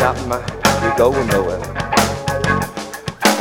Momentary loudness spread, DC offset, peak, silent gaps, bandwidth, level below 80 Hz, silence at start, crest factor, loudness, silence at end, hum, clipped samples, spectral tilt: 9 LU; under 0.1%; 0 dBFS; none; 17.5 kHz; -36 dBFS; 0 s; 18 dB; -17 LUFS; 0 s; none; under 0.1%; -4 dB/octave